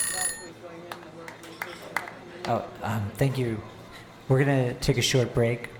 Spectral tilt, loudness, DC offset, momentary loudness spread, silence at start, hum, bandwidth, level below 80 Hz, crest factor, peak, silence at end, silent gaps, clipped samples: -4.5 dB/octave; -27 LUFS; under 0.1%; 19 LU; 0 s; none; over 20 kHz; -50 dBFS; 20 dB; -8 dBFS; 0 s; none; under 0.1%